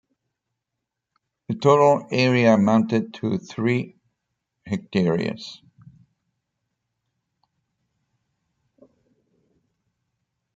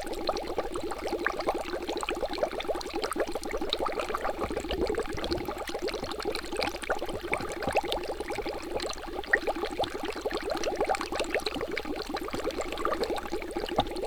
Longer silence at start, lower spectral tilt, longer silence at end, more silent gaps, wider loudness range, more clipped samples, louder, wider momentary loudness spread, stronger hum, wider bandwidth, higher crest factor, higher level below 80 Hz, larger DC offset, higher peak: first, 1.5 s vs 0 s; first, -7 dB/octave vs -3.5 dB/octave; first, 5 s vs 0 s; neither; first, 10 LU vs 1 LU; neither; first, -21 LUFS vs -32 LUFS; first, 15 LU vs 4 LU; neither; second, 7.8 kHz vs over 20 kHz; about the same, 22 dB vs 22 dB; second, -68 dBFS vs -44 dBFS; neither; first, -4 dBFS vs -10 dBFS